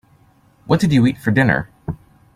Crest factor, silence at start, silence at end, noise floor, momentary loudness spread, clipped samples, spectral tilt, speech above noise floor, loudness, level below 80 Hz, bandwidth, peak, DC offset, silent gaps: 18 dB; 0.65 s; 0.4 s; -53 dBFS; 16 LU; under 0.1%; -7 dB/octave; 38 dB; -16 LUFS; -46 dBFS; 15.5 kHz; -2 dBFS; under 0.1%; none